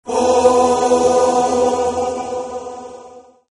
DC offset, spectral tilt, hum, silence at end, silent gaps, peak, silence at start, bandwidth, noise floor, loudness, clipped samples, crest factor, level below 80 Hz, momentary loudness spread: under 0.1%; -4 dB/octave; none; 0.3 s; none; 0 dBFS; 0.05 s; 11.5 kHz; -41 dBFS; -15 LUFS; under 0.1%; 16 dB; -48 dBFS; 17 LU